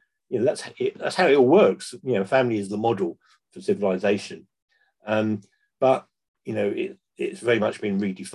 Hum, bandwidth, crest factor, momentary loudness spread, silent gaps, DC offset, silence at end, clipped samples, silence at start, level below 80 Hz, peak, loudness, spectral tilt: none; 12 kHz; 18 dB; 14 LU; 4.62-4.68 s, 6.28-6.34 s; under 0.1%; 0 s; under 0.1%; 0.3 s; -68 dBFS; -6 dBFS; -24 LUFS; -6 dB/octave